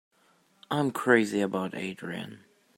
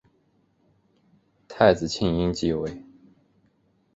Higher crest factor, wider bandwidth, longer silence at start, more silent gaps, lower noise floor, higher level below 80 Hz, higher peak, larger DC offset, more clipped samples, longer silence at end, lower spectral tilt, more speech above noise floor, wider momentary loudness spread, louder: about the same, 22 dB vs 24 dB; first, 16 kHz vs 8 kHz; second, 0.7 s vs 1.5 s; neither; about the same, -66 dBFS vs -66 dBFS; second, -74 dBFS vs -48 dBFS; second, -8 dBFS vs -2 dBFS; neither; neither; second, 0.4 s vs 1.15 s; about the same, -5.5 dB/octave vs -6 dB/octave; second, 38 dB vs 44 dB; second, 15 LU vs 20 LU; second, -28 LUFS vs -23 LUFS